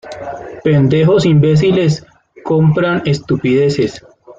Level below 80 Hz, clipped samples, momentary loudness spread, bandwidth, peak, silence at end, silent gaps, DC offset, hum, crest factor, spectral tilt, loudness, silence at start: -46 dBFS; under 0.1%; 13 LU; 7.8 kHz; -2 dBFS; 0.05 s; none; under 0.1%; none; 12 dB; -7.5 dB/octave; -13 LUFS; 0.05 s